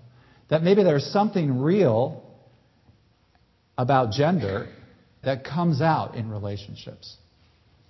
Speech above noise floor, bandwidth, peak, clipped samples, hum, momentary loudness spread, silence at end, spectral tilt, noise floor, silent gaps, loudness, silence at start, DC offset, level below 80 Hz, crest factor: 40 dB; 6 kHz; -6 dBFS; under 0.1%; none; 20 LU; 0.75 s; -8 dB/octave; -63 dBFS; none; -23 LUFS; 0.5 s; under 0.1%; -56 dBFS; 18 dB